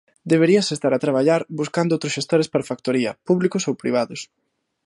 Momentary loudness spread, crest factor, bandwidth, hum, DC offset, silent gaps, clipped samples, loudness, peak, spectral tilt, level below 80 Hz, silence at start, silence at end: 7 LU; 16 dB; 11.5 kHz; none; under 0.1%; none; under 0.1%; -20 LUFS; -4 dBFS; -5.5 dB/octave; -66 dBFS; 0.25 s; 0.6 s